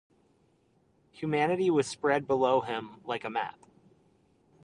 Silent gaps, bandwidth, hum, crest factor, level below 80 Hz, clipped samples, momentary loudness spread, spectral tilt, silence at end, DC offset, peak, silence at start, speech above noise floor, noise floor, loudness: none; 11 kHz; none; 20 dB; -72 dBFS; under 0.1%; 11 LU; -5.5 dB/octave; 1.15 s; under 0.1%; -12 dBFS; 1.15 s; 39 dB; -68 dBFS; -29 LUFS